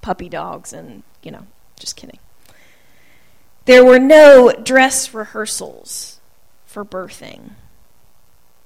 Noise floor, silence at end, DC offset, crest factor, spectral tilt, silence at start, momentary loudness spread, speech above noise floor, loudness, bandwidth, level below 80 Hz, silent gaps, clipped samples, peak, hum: -55 dBFS; 1.6 s; 0.7%; 14 dB; -3 dB/octave; 0.05 s; 27 LU; 43 dB; -9 LUFS; 15.5 kHz; -50 dBFS; none; 0.3%; 0 dBFS; none